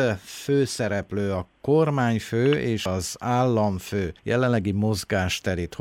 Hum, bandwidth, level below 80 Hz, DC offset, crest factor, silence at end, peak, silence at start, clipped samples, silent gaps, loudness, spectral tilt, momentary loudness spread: none; 16.5 kHz; -50 dBFS; under 0.1%; 14 dB; 0 s; -10 dBFS; 0 s; under 0.1%; none; -24 LUFS; -6 dB/octave; 7 LU